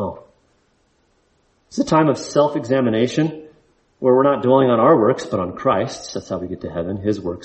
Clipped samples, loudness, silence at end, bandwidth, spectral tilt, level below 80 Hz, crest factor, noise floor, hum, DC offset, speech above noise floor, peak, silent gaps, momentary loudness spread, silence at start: under 0.1%; -18 LUFS; 0 s; 8.4 kHz; -6.5 dB/octave; -54 dBFS; 16 dB; -62 dBFS; none; under 0.1%; 44 dB; -2 dBFS; none; 13 LU; 0 s